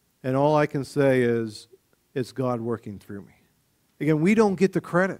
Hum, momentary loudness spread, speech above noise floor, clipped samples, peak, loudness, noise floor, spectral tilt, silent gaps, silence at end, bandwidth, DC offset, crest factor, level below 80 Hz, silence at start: none; 18 LU; 44 dB; under 0.1%; -8 dBFS; -24 LUFS; -67 dBFS; -7 dB/octave; none; 0 s; 16 kHz; under 0.1%; 18 dB; -62 dBFS; 0.25 s